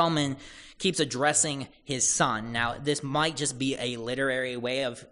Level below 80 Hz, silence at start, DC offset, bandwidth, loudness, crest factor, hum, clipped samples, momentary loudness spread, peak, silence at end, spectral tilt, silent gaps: -56 dBFS; 0 s; under 0.1%; 11 kHz; -27 LUFS; 20 dB; none; under 0.1%; 8 LU; -10 dBFS; 0.05 s; -3 dB/octave; none